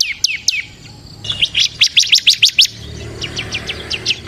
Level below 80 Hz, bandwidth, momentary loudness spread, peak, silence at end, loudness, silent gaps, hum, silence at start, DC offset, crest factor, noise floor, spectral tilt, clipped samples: -42 dBFS; 16 kHz; 18 LU; 0 dBFS; 0 s; -12 LUFS; none; none; 0 s; under 0.1%; 16 dB; -36 dBFS; 0 dB/octave; under 0.1%